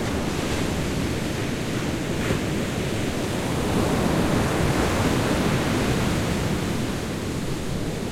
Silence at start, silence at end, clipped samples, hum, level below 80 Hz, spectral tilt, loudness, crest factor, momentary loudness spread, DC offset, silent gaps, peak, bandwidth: 0 s; 0 s; under 0.1%; none; -36 dBFS; -5.5 dB/octave; -24 LUFS; 14 dB; 6 LU; under 0.1%; none; -8 dBFS; 16.5 kHz